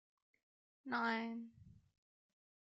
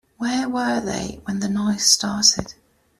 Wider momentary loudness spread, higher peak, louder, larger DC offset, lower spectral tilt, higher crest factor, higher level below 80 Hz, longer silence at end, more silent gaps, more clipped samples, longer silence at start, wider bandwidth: first, 19 LU vs 12 LU; second, -28 dBFS vs -2 dBFS; second, -42 LUFS vs -20 LUFS; neither; about the same, -2 dB/octave vs -2 dB/octave; about the same, 20 dB vs 20 dB; second, -82 dBFS vs -50 dBFS; first, 1 s vs 0.5 s; neither; neither; first, 0.85 s vs 0.2 s; second, 7.6 kHz vs 14.5 kHz